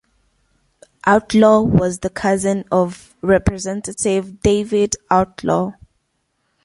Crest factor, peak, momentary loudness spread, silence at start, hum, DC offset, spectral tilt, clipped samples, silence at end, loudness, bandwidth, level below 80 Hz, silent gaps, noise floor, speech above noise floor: 18 dB; 0 dBFS; 10 LU; 1.05 s; none; under 0.1%; -5.5 dB/octave; under 0.1%; 0.9 s; -17 LUFS; 11.5 kHz; -38 dBFS; none; -69 dBFS; 52 dB